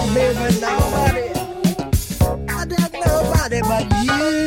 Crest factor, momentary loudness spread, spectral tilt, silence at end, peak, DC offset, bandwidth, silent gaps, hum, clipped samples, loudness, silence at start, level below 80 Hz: 14 dB; 5 LU; -5.5 dB/octave; 0 s; -4 dBFS; under 0.1%; 17 kHz; none; none; under 0.1%; -19 LUFS; 0 s; -28 dBFS